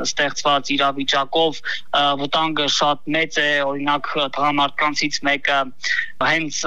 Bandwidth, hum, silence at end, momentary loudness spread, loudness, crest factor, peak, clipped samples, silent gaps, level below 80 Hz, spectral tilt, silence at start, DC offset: 11.5 kHz; none; 0 s; 4 LU; -19 LUFS; 16 dB; -4 dBFS; under 0.1%; none; -58 dBFS; -2.5 dB/octave; 0 s; 3%